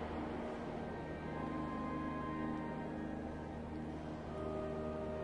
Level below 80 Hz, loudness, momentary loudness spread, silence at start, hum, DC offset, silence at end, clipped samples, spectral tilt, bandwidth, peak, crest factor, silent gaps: -56 dBFS; -43 LUFS; 4 LU; 0 s; none; under 0.1%; 0 s; under 0.1%; -8 dB/octave; 11 kHz; -30 dBFS; 14 dB; none